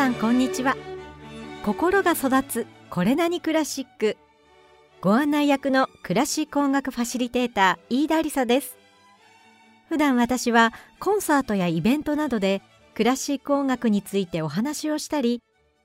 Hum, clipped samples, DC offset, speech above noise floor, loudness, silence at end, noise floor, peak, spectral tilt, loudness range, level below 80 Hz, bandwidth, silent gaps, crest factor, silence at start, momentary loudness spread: none; under 0.1%; under 0.1%; 33 dB; -23 LUFS; 0.45 s; -55 dBFS; -6 dBFS; -4.5 dB/octave; 2 LU; -56 dBFS; 16 kHz; none; 18 dB; 0 s; 10 LU